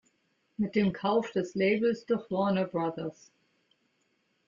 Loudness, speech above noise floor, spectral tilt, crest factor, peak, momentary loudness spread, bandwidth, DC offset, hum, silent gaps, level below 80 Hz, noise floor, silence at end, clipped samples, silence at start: -30 LUFS; 45 dB; -7 dB/octave; 16 dB; -14 dBFS; 9 LU; 7.4 kHz; under 0.1%; none; none; -68 dBFS; -74 dBFS; 1.35 s; under 0.1%; 0.6 s